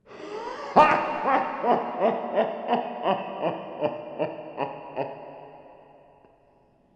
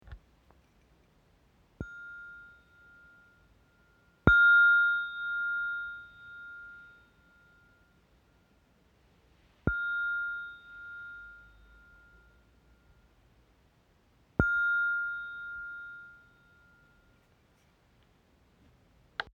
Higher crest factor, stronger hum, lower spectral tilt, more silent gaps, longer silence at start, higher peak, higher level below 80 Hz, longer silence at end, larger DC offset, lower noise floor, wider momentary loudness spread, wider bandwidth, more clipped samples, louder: about the same, 24 dB vs 28 dB; neither; about the same, -6 dB/octave vs -7 dB/octave; neither; about the same, 0.1 s vs 0.1 s; about the same, -4 dBFS vs -6 dBFS; second, -68 dBFS vs -52 dBFS; first, 1.2 s vs 0.15 s; neither; second, -61 dBFS vs -67 dBFS; second, 16 LU vs 26 LU; first, 8.8 kHz vs 7 kHz; neither; about the same, -26 LUFS vs -28 LUFS